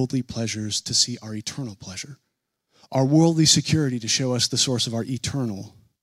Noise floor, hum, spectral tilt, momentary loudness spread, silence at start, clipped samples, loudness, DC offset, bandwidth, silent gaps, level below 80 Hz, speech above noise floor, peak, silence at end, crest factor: -75 dBFS; none; -4 dB/octave; 17 LU; 0 s; under 0.1%; -22 LUFS; under 0.1%; 14.5 kHz; none; -56 dBFS; 52 dB; -4 dBFS; 0.35 s; 20 dB